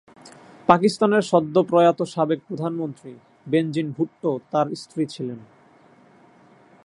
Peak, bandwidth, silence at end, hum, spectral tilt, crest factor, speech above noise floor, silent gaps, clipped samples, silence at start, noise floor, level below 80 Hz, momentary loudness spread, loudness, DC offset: 0 dBFS; 11.5 kHz; 1.4 s; none; -6.5 dB/octave; 22 dB; 32 dB; none; under 0.1%; 0.25 s; -53 dBFS; -66 dBFS; 13 LU; -22 LUFS; under 0.1%